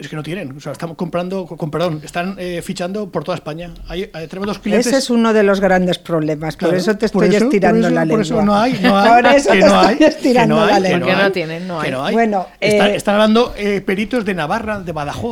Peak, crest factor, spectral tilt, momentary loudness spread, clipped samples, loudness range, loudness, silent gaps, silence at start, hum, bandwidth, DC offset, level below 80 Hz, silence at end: 0 dBFS; 14 dB; -5.5 dB/octave; 14 LU; under 0.1%; 11 LU; -15 LUFS; none; 0 s; none; 16 kHz; under 0.1%; -42 dBFS; 0 s